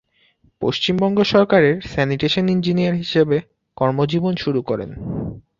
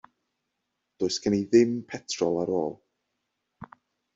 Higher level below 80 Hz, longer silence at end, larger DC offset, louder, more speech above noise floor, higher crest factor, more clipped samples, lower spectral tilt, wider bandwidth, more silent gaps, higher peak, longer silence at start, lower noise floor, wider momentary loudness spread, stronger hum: first, -48 dBFS vs -66 dBFS; second, 0.2 s vs 0.5 s; neither; first, -19 LUFS vs -26 LUFS; second, 40 dB vs 56 dB; about the same, 18 dB vs 22 dB; neither; first, -7 dB/octave vs -5 dB/octave; about the same, 7.4 kHz vs 7.8 kHz; neither; first, -2 dBFS vs -8 dBFS; second, 0.6 s vs 1 s; second, -58 dBFS vs -81 dBFS; about the same, 10 LU vs 12 LU; neither